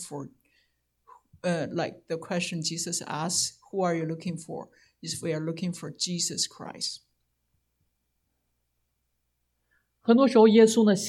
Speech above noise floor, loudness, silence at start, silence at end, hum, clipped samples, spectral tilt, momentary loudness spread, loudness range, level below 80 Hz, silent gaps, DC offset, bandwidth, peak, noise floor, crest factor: 51 dB; -26 LUFS; 0 s; 0 s; none; under 0.1%; -4.5 dB/octave; 19 LU; 9 LU; -72 dBFS; none; under 0.1%; 14 kHz; -6 dBFS; -77 dBFS; 20 dB